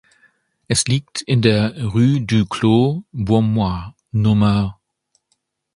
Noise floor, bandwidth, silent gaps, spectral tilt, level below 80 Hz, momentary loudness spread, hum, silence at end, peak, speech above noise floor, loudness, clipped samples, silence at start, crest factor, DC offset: -69 dBFS; 11.5 kHz; none; -6 dB/octave; -42 dBFS; 7 LU; none; 1.05 s; 0 dBFS; 53 dB; -18 LUFS; under 0.1%; 0.7 s; 18 dB; under 0.1%